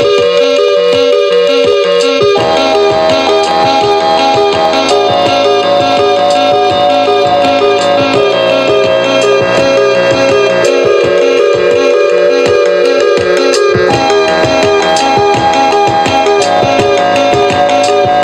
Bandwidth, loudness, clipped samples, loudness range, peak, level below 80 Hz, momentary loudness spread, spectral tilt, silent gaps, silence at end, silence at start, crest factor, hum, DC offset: 12 kHz; -8 LUFS; under 0.1%; 0 LU; 0 dBFS; -42 dBFS; 1 LU; -4 dB/octave; none; 0 s; 0 s; 8 dB; none; under 0.1%